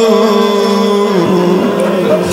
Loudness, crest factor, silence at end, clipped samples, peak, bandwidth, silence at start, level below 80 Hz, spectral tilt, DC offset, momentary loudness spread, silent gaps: -11 LUFS; 10 dB; 0 s; 0.2%; 0 dBFS; 16.5 kHz; 0 s; -54 dBFS; -6 dB/octave; under 0.1%; 3 LU; none